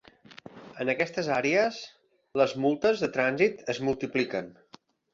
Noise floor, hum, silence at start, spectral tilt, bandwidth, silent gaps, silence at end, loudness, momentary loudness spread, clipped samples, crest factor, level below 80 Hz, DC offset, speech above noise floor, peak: -57 dBFS; none; 0.3 s; -5 dB/octave; 7.6 kHz; none; 0.6 s; -27 LUFS; 20 LU; under 0.1%; 20 dB; -66 dBFS; under 0.1%; 30 dB; -10 dBFS